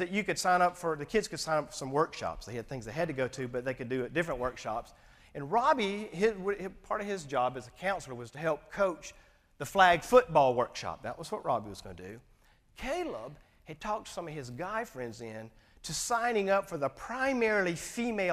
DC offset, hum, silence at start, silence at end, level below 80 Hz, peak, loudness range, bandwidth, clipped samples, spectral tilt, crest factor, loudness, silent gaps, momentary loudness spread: under 0.1%; none; 0 s; 0 s; -58 dBFS; -8 dBFS; 10 LU; 15.5 kHz; under 0.1%; -4 dB/octave; 24 dB; -32 LUFS; none; 17 LU